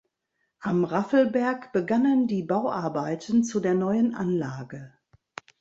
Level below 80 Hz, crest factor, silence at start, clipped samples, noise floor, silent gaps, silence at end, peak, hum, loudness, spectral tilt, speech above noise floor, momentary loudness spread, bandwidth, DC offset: -66 dBFS; 16 dB; 0.6 s; under 0.1%; -77 dBFS; none; 0.75 s; -10 dBFS; none; -25 LUFS; -7 dB/octave; 53 dB; 17 LU; 7.8 kHz; under 0.1%